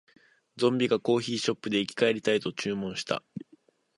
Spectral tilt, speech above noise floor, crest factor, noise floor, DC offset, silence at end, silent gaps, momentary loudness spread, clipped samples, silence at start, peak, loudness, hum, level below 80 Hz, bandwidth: -4.5 dB/octave; 35 dB; 20 dB; -62 dBFS; under 0.1%; 0.6 s; none; 8 LU; under 0.1%; 0.55 s; -10 dBFS; -28 LUFS; none; -70 dBFS; 11.5 kHz